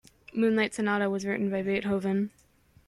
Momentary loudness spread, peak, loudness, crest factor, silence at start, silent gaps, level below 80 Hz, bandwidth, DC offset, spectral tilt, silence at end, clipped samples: 5 LU; -14 dBFS; -28 LUFS; 16 dB; 0.35 s; none; -64 dBFS; 12 kHz; under 0.1%; -6 dB/octave; 0.6 s; under 0.1%